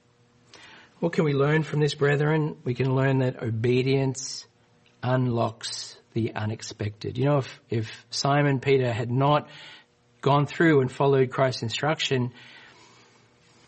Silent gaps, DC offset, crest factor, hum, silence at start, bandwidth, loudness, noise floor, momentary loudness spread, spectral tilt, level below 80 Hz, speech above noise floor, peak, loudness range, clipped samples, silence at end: none; under 0.1%; 18 dB; none; 0.55 s; 8.8 kHz; -25 LUFS; -61 dBFS; 11 LU; -6 dB/octave; -64 dBFS; 36 dB; -8 dBFS; 5 LU; under 0.1%; 1.1 s